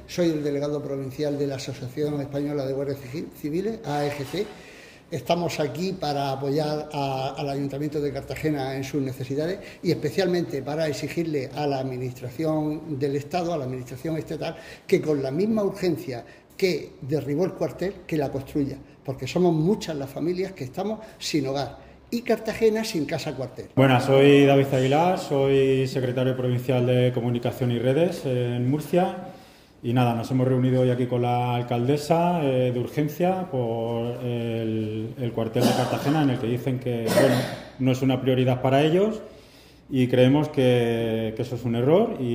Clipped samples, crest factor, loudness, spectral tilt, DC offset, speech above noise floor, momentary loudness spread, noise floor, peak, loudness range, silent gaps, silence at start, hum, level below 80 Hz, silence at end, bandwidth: under 0.1%; 20 dB; -25 LUFS; -6.5 dB/octave; under 0.1%; 26 dB; 11 LU; -50 dBFS; -4 dBFS; 8 LU; none; 0 s; none; -56 dBFS; 0 s; 16 kHz